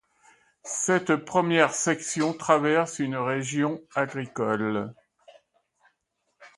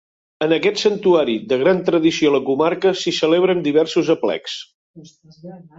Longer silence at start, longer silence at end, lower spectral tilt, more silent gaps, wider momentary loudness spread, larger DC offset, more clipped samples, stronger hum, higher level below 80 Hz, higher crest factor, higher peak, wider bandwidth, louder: first, 0.65 s vs 0.4 s; about the same, 0.1 s vs 0.15 s; about the same, -4 dB/octave vs -5 dB/octave; second, none vs 4.75-4.94 s; first, 9 LU vs 6 LU; neither; neither; neither; second, -70 dBFS vs -62 dBFS; first, 22 dB vs 14 dB; about the same, -4 dBFS vs -4 dBFS; first, 11.5 kHz vs 7.8 kHz; second, -25 LUFS vs -17 LUFS